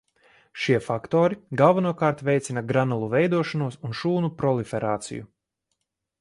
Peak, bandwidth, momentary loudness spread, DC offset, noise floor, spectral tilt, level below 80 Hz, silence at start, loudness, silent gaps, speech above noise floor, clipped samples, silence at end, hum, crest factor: -4 dBFS; 11.5 kHz; 10 LU; under 0.1%; -79 dBFS; -6.5 dB/octave; -62 dBFS; 0.55 s; -24 LUFS; none; 56 dB; under 0.1%; 0.95 s; none; 20 dB